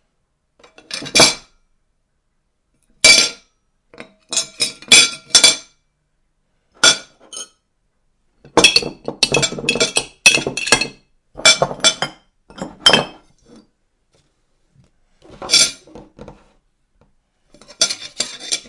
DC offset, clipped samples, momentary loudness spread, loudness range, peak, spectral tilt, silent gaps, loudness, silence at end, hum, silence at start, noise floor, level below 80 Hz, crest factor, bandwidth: under 0.1%; under 0.1%; 21 LU; 7 LU; 0 dBFS; 0 dB/octave; none; -13 LUFS; 0.1 s; none; 0.9 s; -68 dBFS; -50 dBFS; 20 dB; 12 kHz